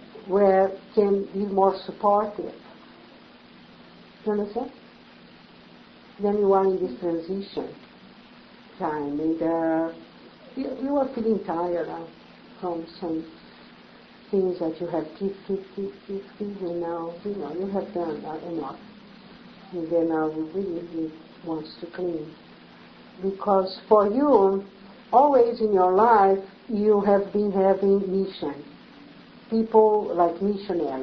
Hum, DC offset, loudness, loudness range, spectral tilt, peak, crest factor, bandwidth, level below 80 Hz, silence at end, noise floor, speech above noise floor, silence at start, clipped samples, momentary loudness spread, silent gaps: none; under 0.1%; -24 LUFS; 11 LU; -9 dB/octave; -4 dBFS; 20 dB; 5.8 kHz; -62 dBFS; 0 s; -50 dBFS; 26 dB; 0 s; under 0.1%; 16 LU; none